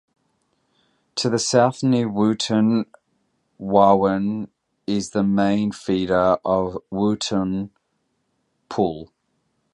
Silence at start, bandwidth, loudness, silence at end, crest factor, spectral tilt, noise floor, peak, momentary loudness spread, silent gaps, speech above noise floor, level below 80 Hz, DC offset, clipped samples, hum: 1.15 s; 11 kHz; -21 LUFS; 0.7 s; 20 dB; -5.5 dB/octave; -71 dBFS; -2 dBFS; 14 LU; none; 52 dB; -54 dBFS; under 0.1%; under 0.1%; none